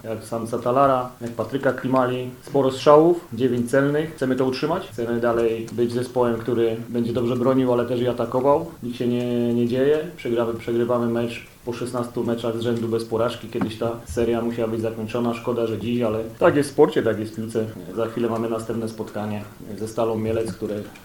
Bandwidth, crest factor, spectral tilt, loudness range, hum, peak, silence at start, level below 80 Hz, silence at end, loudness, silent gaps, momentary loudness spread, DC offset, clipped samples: 19 kHz; 22 dB; -6.5 dB/octave; 5 LU; none; 0 dBFS; 0.05 s; -52 dBFS; 0 s; -23 LUFS; none; 10 LU; under 0.1%; under 0.1%